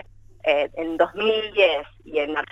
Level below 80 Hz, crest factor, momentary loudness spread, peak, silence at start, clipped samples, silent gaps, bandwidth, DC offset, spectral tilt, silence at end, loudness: -54 dBFS; 18 dB; 8 LU; -6 dBFS; 0.45 s; under 0.1%; none; 7.8 kHz; under 0.1%; -5 dB/octave; 0.05 s; -22 LUFS